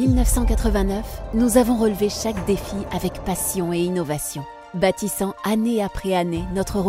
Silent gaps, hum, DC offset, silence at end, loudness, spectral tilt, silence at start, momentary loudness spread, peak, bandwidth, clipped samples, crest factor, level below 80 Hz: none; none; under 0.1%; 0 s; -22 LUFS; -5.5 dB/octave; 0 s; 8 LU; -2 dBFS; 16 kHz; under 0.1%; 18 dB; -28 dBFS